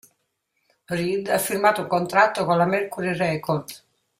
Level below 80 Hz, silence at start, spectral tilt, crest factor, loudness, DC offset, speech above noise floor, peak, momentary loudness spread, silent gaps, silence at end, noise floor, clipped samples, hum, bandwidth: -62 dBFS; 0.9 s; -5 dB/octave; 20 dB; -22 LUFS; under 0.1%; 52 dB; -4 dBFS; 8 LU; none; 0.4 s; -74 dBFS; under 0.1%; none; 16 kHz